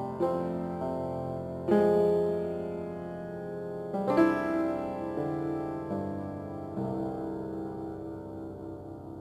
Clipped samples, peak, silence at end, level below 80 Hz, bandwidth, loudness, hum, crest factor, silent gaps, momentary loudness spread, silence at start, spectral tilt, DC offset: under 0.1%; -12 dBFS; 0 s; -58 dBFS; 13 kHz; -32 LUFS; none; 20 dB; none; 15 LU; 0 s; -8.5 dB/octave; under 0.1%